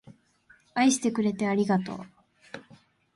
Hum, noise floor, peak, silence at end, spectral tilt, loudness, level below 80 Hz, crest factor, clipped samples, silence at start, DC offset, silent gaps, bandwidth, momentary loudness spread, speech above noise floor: none; -61 dBFS; -12 dBFS; 0.55 s; -4.5 dB/octave; -26 LUFS; -70 dBFS; 18 dB; under 0.1%; 0.05 s; under 0.1%; none; 11.5 kHz; 22 LU; 36 dB